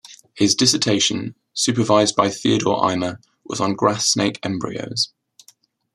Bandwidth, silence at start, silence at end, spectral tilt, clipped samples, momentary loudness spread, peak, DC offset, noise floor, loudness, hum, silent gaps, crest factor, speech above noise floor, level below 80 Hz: 13.5 kHz; 0.1 s; 0.9 s; -3.5 dB/octave; under 0.1%; 11 LU; -2 dBFS; under 0.1%; -55 dBFS; -19 LUFS; none; none; 18 dB; 36 dB; -60 dBFS